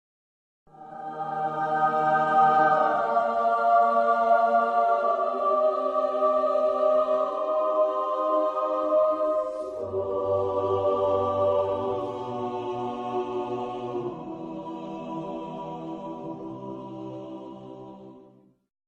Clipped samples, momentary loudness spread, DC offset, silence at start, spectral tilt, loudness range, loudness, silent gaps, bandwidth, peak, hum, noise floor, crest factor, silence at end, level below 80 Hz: under 0.1%; 16 LU; under 0.1%; 0.75 s; -7 dB/octave; 14 LU; -25 LUFS; none; 7.8 kHz; -10 dBFS; none; -55 dBFS; 16 dB; 0.65 s; -66 dBFS